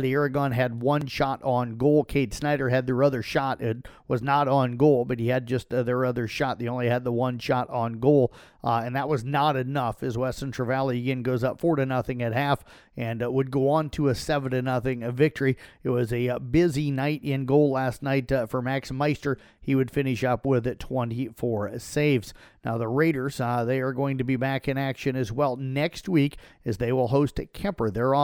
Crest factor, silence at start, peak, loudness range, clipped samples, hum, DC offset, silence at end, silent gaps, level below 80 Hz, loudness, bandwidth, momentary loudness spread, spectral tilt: 18 dB; 0 s; -8 dBFS; 2 LU; under 0.1%; none; under 0.1%; 0 s; none; -50 dBFS; -26 LUFS; 17 kHz; 7 LU; -7 dB/octave